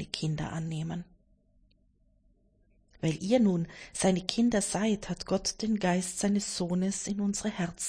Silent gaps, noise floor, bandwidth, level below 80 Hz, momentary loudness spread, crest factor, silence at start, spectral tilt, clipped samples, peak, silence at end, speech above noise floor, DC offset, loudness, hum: none; -67 dBFS; 10.5 kHz; -56 dBFS; 8 LU; 24 dB; 0 s; -5 dB/octave; under 0.1%; -8 dBFS; 0 s; 37 dB; under 0.1%; -30 LUFS; none